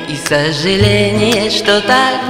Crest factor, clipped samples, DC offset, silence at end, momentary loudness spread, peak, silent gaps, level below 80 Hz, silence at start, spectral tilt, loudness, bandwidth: 12 dB; 0.3%; under 0.1%; 0 s; 3 LU; 0 dBFS; none; -34 dBFS; 0 s; -4.5 dB/octave; -12 LUFS; 16.5 kHz